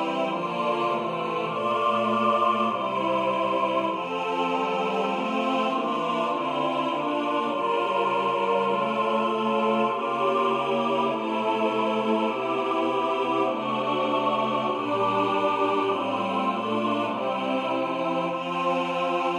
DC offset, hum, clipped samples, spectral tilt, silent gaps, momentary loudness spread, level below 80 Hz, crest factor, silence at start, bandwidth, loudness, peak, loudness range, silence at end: under 0.1%; none; under 0.1%; -5.5 dB/octave; none; 3 LU; -74 dBFS; 14 dB; 0 s; 12 kHz; -25 LUFS; -10 dBFS; 1 LU; 0 s